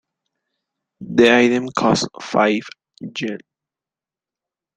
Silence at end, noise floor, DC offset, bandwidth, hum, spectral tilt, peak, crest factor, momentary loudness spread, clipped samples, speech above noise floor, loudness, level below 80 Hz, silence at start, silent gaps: 1.4 s; -90 dBFS; under 0.1%; 9.4 kHz; none; -4.5 dB/octave; 0 dBFS; 20 dB; 17 LU; under 0.1%; 72 dB; -17 LUFS; -58 dBFS; 1 s; none